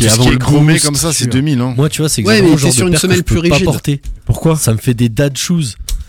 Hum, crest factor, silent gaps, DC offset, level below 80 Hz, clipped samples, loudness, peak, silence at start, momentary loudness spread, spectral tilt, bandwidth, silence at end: none; 10 dB; none; 0.2%; -26 dBFS; under 0.1%; -12 LUFS; 0 dBFS; 0 s; 7 LU; -4.5 dB/octave; 18.5 kHz; 0.05 s